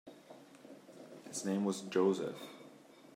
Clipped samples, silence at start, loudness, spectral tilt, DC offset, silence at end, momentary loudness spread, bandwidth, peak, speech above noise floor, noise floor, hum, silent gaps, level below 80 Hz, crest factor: under 0.1%; 0.05 s; -36 LUFS; -5 dB/octave; under 0.1%; 0.05 s; 24 LU; 16 kHz; -20 dBFS; 23 dB; -58 dBFS; none; none; -88 dBFS; 20 dB